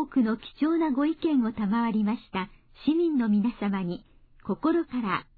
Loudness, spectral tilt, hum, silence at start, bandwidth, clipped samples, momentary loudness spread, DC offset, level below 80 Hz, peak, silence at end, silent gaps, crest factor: -27 LUFS; -10.5 dB/octave; none; 0 s; 4.8 kHz; under 0.1%; 10 LU; under 0.1%; -56 dBFS; -14 dBFS; 0.15 s; none; 12 dB